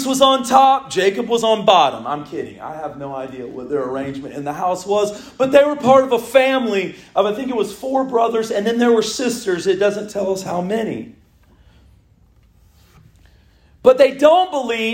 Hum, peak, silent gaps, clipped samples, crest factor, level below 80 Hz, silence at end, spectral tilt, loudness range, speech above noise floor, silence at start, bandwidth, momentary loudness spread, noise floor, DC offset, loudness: none; 0 dBFS; none; under 0.1%; 18 dB; -56 dBFS; 0 s; -4 dB/octave; 8 LU; 36 dB; 0 s; 16.5 kHz; 15 LU; -52 dBFS; under 0.1%; -17 LUFS